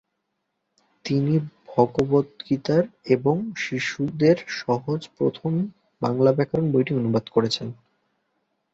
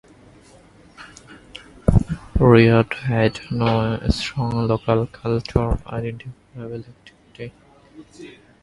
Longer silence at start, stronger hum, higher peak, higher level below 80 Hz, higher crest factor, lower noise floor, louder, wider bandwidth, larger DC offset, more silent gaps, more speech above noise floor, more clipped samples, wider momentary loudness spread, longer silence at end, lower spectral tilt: about the same, 1.05 s vs 1 s; neither; about the same, -2 dBFS vs 0 dBFS; second, -60 dBFS vs -32 dBFS; about the same, 20 dB vs 22 dB; first, -77 dBFS vs -49 dBFS; second, -23 LUFS vs -20 LUFS; second, 8 kHz vs 11.5 kHz; neither; neither; first, 55 dB vs 29 dB; neither; second, 8 LU vs 26 LU; first, 1 s vs 0.3 s; about the same, -7 dB/octave vs -7.5 dB/octave